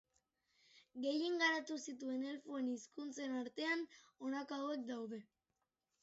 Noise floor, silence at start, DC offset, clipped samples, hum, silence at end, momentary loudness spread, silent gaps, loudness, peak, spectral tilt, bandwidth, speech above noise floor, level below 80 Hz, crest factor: -89 dBFS; 0.75 s; under 0.1%; under 0.1%; none; 0.8 s; 13 LU; none; -42 LUFS; -24 dBFS; -1 dB/octave; 8 kHz; 47 dB; under -90 dBFS; 20 dB